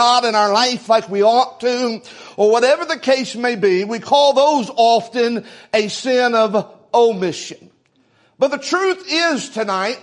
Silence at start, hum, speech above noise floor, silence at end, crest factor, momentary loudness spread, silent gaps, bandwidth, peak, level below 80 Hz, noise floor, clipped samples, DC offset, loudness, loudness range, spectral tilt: 0 s; none; 42 dB; 0.05 s; 16 dB; 8 LU; none; 11 kHz; -2 dBFS; -70 dBFS; -58 dBFS; under 0.1%; under 0.1%; -16 LUFS; 3 LU; -3.5 dB/octave